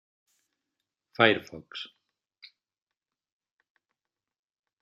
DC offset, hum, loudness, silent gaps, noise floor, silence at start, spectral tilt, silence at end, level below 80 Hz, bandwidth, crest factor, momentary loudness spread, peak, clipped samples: under 0.1%; none; -24 LUFS; none; -87 dBFS; 1.2 s; -5.5 dB/octave; 2.95 s; -76 dBFS; 13 kHz; 30 dB; 21 LU; -4 dBFS; under 0.1%